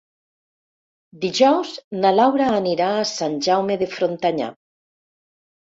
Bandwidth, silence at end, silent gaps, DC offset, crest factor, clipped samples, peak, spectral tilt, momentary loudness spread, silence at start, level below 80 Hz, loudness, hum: 8 kHz; 1.15 s; 1.84-1.91 s; under 0.1%; 18 dB; under 0.1%; -2 dBFS; -4.5 dB/octave; 10 LU; 1.15 s; -64 dBFS; -20 LUFS; none